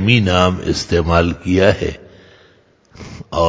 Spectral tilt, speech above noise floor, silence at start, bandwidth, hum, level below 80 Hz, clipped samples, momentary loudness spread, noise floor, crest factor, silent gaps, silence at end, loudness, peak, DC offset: -6 dB/octave; 37 dB; 0 s; 8 kHz; none; -30 dBFS; under 0.1%; 20 LU; -52 dBFS; 16 dB; none; 0 s; -15 LUFS; 0 dBFS; under 0.1%